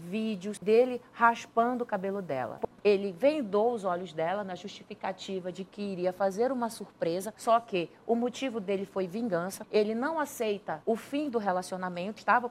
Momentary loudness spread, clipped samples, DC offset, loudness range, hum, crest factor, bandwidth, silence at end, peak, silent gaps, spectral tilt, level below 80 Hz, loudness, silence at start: 10 LU; under 0.1%; under 0.1%; 4 LU; none; 20 dB; 15.5 kHz; 0 s; -10 dBFS; none; -5.5 dB/octave; -72 dBFS; -31 LUFS; 0 s